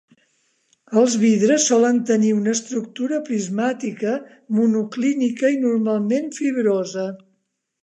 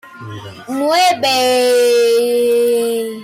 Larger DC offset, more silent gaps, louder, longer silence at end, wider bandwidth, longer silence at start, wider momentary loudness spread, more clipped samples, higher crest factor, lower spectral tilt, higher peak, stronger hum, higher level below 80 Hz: neither; neither; second, -20 LUFS vs -13 LUFS; first, 0.65 s vs 0 s; second, 9 kHz vs 16 kHz; first, 0.9 s vs 0.05 s; second, 9 LU vs 19 LU; neither; first, 16 dB vs 8 dB; first, -4.5 dB/octave vs -3 dB/octave; about the same, -4 dBFS vs -6 dBFS; neither; second, -76 dBFS vs -62 dBFS